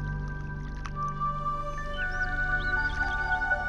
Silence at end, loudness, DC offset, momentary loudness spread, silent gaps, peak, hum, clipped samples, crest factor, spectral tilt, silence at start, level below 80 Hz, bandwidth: 0 s; -31 LUFS; under 0.1%; 10 LU; none; -16 dBFS; 50 Hz at -45 dBFS; under 0.1%; 14 dB; -5.5 dB/octave; 0 s; -36 dBFS; 8.6 kHz